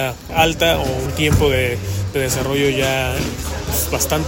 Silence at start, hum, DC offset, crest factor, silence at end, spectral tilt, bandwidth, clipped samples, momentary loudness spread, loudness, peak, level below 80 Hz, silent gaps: 0 s; none; under 0.1%; 18 dB; 0 s; -4 dB/octave; 16.5 kHz; under 0.1%; 7 LU; -18 LUFS; 0 dBFS; -30 dBFS; none